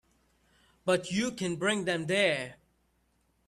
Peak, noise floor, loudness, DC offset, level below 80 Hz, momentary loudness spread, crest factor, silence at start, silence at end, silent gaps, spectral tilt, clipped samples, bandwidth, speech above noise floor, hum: -14 dBFS; -72 dBFS; -30 LUFS; under 0.1%; -68 dBFS; 8 LU; 18 dB; 0.85 s; 0.95 s; none; -4 dB/octave; under 0.1%; 13.5 kHz; 43 dB; none